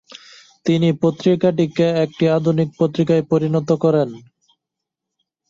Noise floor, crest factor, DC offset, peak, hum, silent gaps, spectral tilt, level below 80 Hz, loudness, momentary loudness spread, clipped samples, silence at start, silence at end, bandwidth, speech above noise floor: -82 dBFS; 14 dB; under 0.1%; -4 dBFS; none; none; -8 dB/octave; -58 dBFS; -18 LUFS; 3 LU; under 0.1%; 0.65 s; 1.3 s; 7.6 kHz; 65 dB